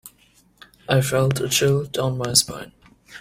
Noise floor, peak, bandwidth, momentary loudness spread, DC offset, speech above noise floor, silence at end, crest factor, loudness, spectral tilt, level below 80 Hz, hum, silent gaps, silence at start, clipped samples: -57 dBFS; 0 dBFS; 16 kHz; 11 LU; under 0.1%; 37 dB; 0 s; 22 dB; -20 LUFS; -3.5 dB/octave; -52 dBFS; none; none; 0.05 s; under 0.1%